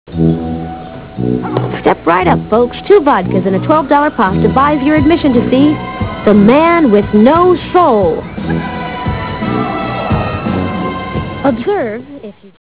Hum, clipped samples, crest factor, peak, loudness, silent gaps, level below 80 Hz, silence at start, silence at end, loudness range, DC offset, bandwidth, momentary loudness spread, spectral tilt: none; 0.5%; 12 dB; 0 dBFS; -12 LUFS; none; -32 dBFS; 0.1 s; 0.15 s; 7 LU; 0.4%; 4 kHz; 12 LU; -11 dB/octave